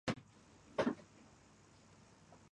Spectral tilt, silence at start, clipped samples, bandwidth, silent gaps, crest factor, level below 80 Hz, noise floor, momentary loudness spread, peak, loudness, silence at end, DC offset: -5.5 dB/octave; 0.05 s; under 0.1%; 11 kHz; none; 24 dB; -72 dBFS; -65 dBFS; 25 LU; -22 dBFS; -42 LUFS; 0.15 s; under 0.1%